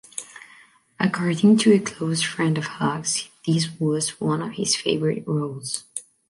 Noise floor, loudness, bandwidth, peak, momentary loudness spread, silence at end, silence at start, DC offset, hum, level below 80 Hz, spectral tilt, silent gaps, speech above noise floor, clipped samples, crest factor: -53 dBFS; -22 LUFS; 11.5 kHz; -6 dBFS; 12 LU; 0.3 s; 0.15 s; under 0.1%; none; -64 dBFS; -4.5 dB/octave; none; 31 dB; under 0.1%; 18 dB